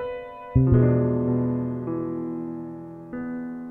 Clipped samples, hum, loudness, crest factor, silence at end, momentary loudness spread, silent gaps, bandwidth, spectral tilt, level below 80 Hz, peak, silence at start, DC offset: under 0.1%; none; -25 LUFS; 16 dB; 0 s; 17 LU; none; 3.2 kHz; -12.5 dB/octave; -40 dBFS; -8 dBFS; 0 s; under 0.1%